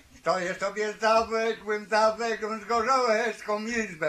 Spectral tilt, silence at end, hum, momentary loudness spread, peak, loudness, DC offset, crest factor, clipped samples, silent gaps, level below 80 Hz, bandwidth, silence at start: -3.5 dB/octave; 0 s; none; 7 LU; -10 dBFS; -26 LUFS; under 0.1%; 18 dB; under 0.1%; none; -60 dBFS; 13.5 kHz; 0.15 s